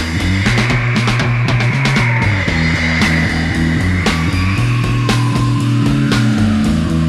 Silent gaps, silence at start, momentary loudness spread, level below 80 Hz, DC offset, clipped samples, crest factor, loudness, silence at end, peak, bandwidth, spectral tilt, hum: none; 0 s; 2 LU; -26 dBFS; under 0.1%; under 0.1%; 14 dB; -14 LUFS; 0 s; 0 dBFS; 12.5 kHz; -6 dB/octave; none